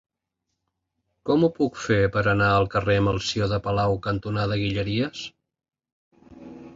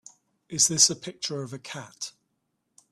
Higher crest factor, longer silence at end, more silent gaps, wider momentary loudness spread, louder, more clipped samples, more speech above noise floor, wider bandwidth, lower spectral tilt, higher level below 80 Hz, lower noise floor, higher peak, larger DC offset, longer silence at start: second, 16 dB vs 24 dB; second, 0.05 s vs 0.8 s; first, 5.92-6.11 s vs none; second, 8 LU vs 20 LU; about the same, -23 LUFS vs -23 LUFS; neither; first, 58 dB vs 50 dB; second, 7.8 kHz vs 14.5 kHz; first, -6 dB/octave vs -1.5 dB/octave; first, -46 dBFS vs -70 dBFS; first, -81 dBFS vs -77 dBFS; second, -8 dBFS vs -4 dBFS; neither; first, 1.25 s vs 0.5 s